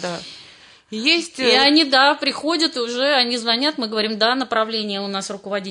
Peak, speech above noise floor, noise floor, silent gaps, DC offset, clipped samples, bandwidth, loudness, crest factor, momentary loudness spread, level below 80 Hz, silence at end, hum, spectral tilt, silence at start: -2 dBFS; 27 dB; -46 dBFS; none; under 0.1%; under 0.1%; 11 kHz; -18 LUFS; 16 dB; 13 LU; -68 dBFS; 0 s; none; -2.5 dB/octave; 0 s